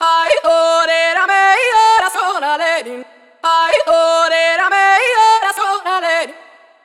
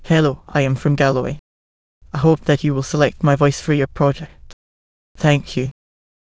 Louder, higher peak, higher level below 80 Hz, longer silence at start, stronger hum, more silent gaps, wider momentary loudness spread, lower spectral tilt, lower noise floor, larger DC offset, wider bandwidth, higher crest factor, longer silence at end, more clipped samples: first, -12 LUFS vs -18 LUFS; about the same, -2 dBFS vs 0 dBFS; second, -58 dBFS vs -42 dBFS; about the same, 0 s vs 0 s; neither; second, none vs 1.39-2.01 s, 4.53-5.15 s; second, 7 LU vs 12 LU; second, 0.5 dB/octave vs -6.5 dB/octave; second, -42 dBFS vs under -90 dBFS; neither; first, 15.5 kHz vs 8 kHz; second, 12 dB vs 18 dB; about the same, 0.5 s vs 0.6 s; neither